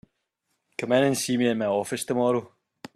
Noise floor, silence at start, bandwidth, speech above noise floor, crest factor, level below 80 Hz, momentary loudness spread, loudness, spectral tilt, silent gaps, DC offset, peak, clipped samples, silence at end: -77 dBFS; 0.8 s; 14.5 kHz; 53 dB; 18 dB; -68 dBFS; 8 LU; -25 LUFS; -4.5 dB/octave; none; under 0.1%; -8 dBFS; under 0.1%; 0.5 s